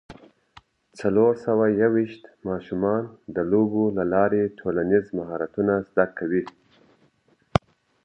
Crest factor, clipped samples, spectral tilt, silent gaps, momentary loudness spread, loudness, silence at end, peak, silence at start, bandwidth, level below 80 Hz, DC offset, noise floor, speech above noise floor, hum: 24 dB; under 0.1%; -8.5 dB/octave; none; 10 LU; -24 LUFS; 0.45 s; 0 dBFS; 0.1 s; 9 kHz; -52 dBFS; under 0.1%; -63 dBFS; 41 dB; none